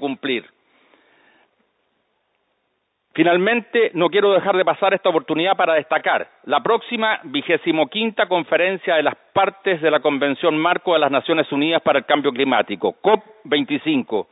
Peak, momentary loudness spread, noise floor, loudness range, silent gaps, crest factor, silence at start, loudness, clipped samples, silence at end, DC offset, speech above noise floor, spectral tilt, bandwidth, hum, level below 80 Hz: 0 dBFS; 5 LU; -71 dBFS; 4 LU; none; 18 dB; 0 s; -19 LUFS; under 0.1%; 0.1 s; under 0.1%; 53 dB; -10 dB/octave; 4 kHz; none; -70 dBFS